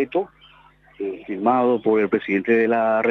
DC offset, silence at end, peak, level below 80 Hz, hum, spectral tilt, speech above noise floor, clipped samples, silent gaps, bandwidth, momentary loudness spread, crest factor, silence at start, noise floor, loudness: under 0.1%; 0 s; -6 dBFS; -64 dBFS; none; -8.5 dB/octave; 32 dB; under 0.1%; none; 4.3 kHz; 12 LU; 14 dB; 0 s; -52 dBFS; -20 LUFS